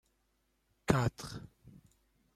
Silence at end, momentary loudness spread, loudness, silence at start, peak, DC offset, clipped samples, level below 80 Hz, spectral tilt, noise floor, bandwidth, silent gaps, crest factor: 0.65 s; 19 LU; -35 LUFS; 0.9 s; -12 dBFS; under 0.1%; under 0.1%; -56 dBFS; -6 dB/octave; -77 dBFS; 14.5 kHz; none; 26 dB